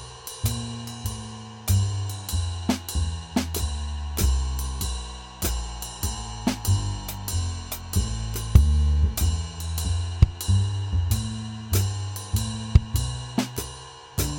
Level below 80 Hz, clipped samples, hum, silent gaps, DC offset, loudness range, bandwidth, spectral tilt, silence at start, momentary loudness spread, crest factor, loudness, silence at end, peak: -28 dBFS; under 0.1%; none; none; under 0.1%; 5 LU; 18.5 kHz; -5 dB/octave; 0 s; 11 LU; 24 dB; -27 LUFS; 0 s; -2 dBFS